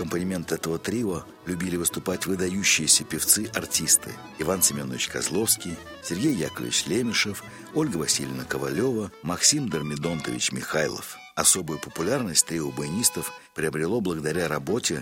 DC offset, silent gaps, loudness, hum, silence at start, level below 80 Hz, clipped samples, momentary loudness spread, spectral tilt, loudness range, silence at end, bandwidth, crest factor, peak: under 0.1%; none; -24 LUFS; none; 0 s; -56 dBFS; under 0.1%; 11 LU; -2.5 dB/octave; 4 LU; 0 s; 16.5 kHz; 22 dB; -4 dBFS